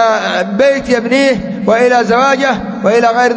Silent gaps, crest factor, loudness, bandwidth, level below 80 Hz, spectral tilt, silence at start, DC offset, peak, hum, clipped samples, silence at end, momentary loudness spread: none; 10 dB; -11 LUFS; 8 kHz; -44 dBFS; -4.5 dB/octave; 0 s; under 0.1%; 0 dBFS; none; under 0.1%; 0 s; 5 LU